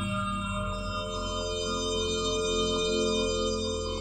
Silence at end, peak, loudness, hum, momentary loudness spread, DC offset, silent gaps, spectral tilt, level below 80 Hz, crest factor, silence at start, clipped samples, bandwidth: 0 s; -16 dBFS; -29 LUFS; none; 6 LU; under 0.1%; none; -3.5 dB/octave; -42 dBFS; 12 dB; 0 s; under 0.1%; 16 kHz